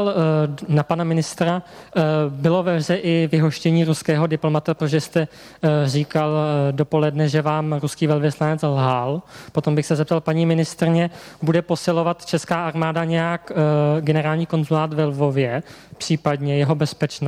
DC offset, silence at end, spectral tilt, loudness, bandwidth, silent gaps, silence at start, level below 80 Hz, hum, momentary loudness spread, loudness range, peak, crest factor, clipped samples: under 0.1%; 0 s; -7 dB/octave; -20 LUFS; 13.5 kHz; none; 0 s; -58 dBFS; none; 5 LU; 1 LU; -6 dBFS; 14 dB; under 0.1%